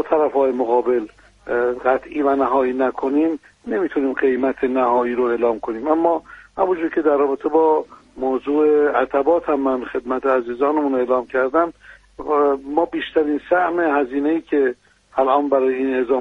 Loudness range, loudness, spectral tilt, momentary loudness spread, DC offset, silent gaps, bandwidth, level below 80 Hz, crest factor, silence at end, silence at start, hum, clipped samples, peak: 2 LU; -19 LUFS; -7 dB/octave; 7 LU; under 0.1%; none; 6.6 kHz; -54 dBFS; 16 dB; 0 s; 0 s; none; under 0.1%; -4 dBFS